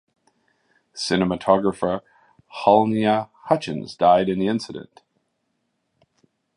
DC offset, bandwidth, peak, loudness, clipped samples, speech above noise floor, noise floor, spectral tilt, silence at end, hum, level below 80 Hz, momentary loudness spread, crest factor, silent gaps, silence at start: under 0.1%; 11.5 kHz; -2 dBFS; -21 LUFS; under 0.1%; 53 dB; -73 dBFS; -6 dB/octave; 1.75 s; none; -56 dBFS; 14 LU; 20 dB; none; 0.95 s